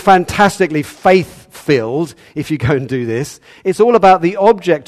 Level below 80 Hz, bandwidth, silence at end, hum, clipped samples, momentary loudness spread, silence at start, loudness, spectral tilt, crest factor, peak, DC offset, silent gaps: -46 dBFS; 14 kHz; 0.05 s; none; 0.3%; 13 LU; 0 s; -13 LUFS; -6 dB/octave; 14 dB; 0 dBFS; under 0.1%; none